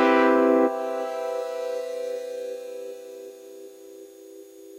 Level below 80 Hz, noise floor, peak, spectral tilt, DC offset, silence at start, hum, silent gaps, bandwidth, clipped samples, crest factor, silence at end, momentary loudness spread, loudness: -72 dBFS; -45 dBFS; -8 dBFS; -4 dB/octave; under 0.1%; 0 s; none; none; 16 kHz; under 0.1%; 18 dB; 0 s; 26 LU; -25 LUFS